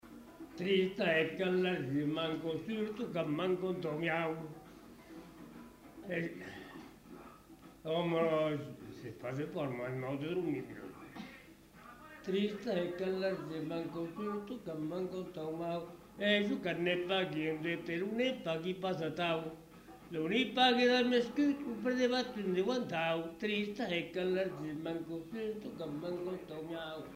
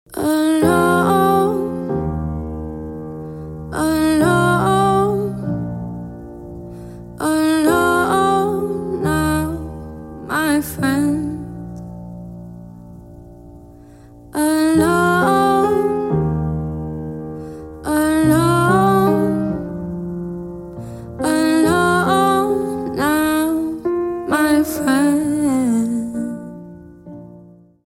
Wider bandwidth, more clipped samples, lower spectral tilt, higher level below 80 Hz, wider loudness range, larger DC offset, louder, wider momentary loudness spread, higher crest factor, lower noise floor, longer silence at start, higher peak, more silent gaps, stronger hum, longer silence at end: about the same, 16 kHz vs 17 kHz; neither; about the same, -6 dB/octave vs -6 dB/octave; second, -70 dBFS vs -40 dBFS; first, 8 LU vs 5 LU; neither; second, -36 LUFS vs -17 LUFS; about the same, 20 LU vs 19 LU; about the same, 20 dB vs 16 dB; first, -57 dBFS vs -44 dBFS; about the same, 0.05 s vs 0.1 s; second, -18 dBFS vs -2 dBFS; neither; neither; second, 0 s vs 0.4 s